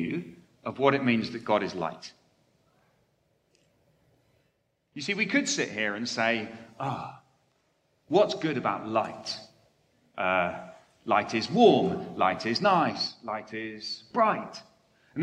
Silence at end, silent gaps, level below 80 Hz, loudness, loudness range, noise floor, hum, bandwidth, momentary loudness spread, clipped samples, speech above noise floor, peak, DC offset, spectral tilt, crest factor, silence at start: 0 s; none; -72 dBFS; -27 LUFS; 8 LU; -74 dBFS; none; 10 kHz; 18 LU; under 0.1%; 46 dB; -8 dBFS; under 0.1%; -4.5 dB/octave; 22 dB; 0 s